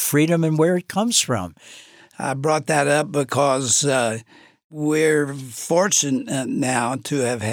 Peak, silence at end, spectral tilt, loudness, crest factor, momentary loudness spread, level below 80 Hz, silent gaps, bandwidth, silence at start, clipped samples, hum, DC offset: -4 dBFS; 0 s; -4 dB/octave; -20 LUFS; 16 dB; 10 LU; -66 dBFS; 4.64-4.70 s; over 20 kHz; 0 s; under 0.1%; none; under 0.1%